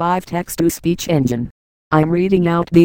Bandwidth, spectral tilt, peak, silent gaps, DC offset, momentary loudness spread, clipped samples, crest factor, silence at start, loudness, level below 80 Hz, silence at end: 17 kHz; -6.5 dB/octave; 0 dBFS; 1.51-1.91 s; under 0.1%; 8 LU; under 0.1%; 16 dB; 0 s; -17 LUFS; -42 dBFS; 0 s